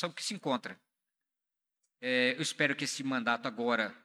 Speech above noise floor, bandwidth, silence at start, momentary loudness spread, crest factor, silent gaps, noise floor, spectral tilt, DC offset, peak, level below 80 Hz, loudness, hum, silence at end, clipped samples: 53 dB; 14.5 kHz; 0 s; 7 LU; 20 dB; none; -86 dBFS; -3 dB/octave; under 0.1%; -14 dBFS; under -90 dBFS; -32 LUFS; none; 0.05 s; under 0.1%